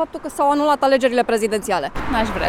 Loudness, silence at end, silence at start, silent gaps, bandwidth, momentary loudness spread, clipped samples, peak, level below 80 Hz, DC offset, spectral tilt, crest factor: -19 LUFS; 0 s; 0 s; none; 16 kHz; 7 LU; under 0.1%; -4 dBFS; -38 dBFS; under 0.1%; -4.5 dB/octave; 16 dB